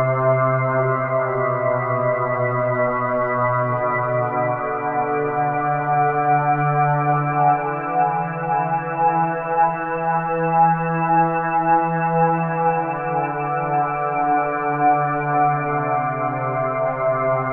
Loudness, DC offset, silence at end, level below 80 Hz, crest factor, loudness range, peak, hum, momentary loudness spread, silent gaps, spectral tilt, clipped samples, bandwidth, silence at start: -20 LUFS; under 0.1%; 0 s; -54 dBFS; 14 dB; 2 LU; -4 dBFS; none; 4 LU; none; -8 dB/octave; under 0.1%; 3.7 kHz; 0 s